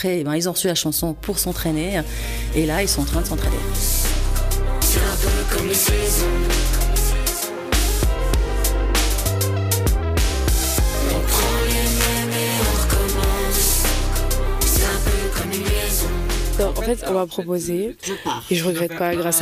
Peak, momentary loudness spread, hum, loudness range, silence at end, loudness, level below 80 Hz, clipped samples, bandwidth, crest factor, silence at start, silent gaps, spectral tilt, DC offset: -6 dBFS; 5 LU; none; 3 LU; 0 s; -20 LUFS; -22 dBFS; under 0.1%; 15.5 kHz; 12 dB; 0 s; none; -3.5 dB/octave; under 0.1%